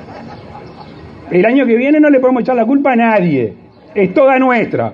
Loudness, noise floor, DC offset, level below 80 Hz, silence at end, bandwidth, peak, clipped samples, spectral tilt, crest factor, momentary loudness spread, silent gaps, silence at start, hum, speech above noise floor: -11 LUFS; -33 dBFS; under 0.1%; -52 dBFS; 0 s; 5.6 kHz; 0 dBFS; under 0.1%; -9 dB/octave; 12 dB; 22 LU; none; 0 s; none; 22 dB